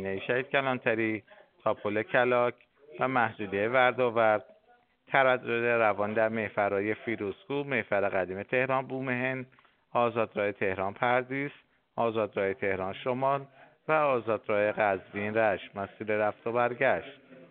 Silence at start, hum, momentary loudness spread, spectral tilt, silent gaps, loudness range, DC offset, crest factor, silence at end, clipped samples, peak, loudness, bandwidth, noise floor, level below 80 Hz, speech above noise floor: 0 s; none; 9 LU; -4 dB/octave; none; 4 LU; under 0.1%; 22 dB; 0.05 s; under 0.1%; -8 dBFS; -29 LUFS; 4.4 kHz; -65 dBFS; -74 dBFS; 36 dB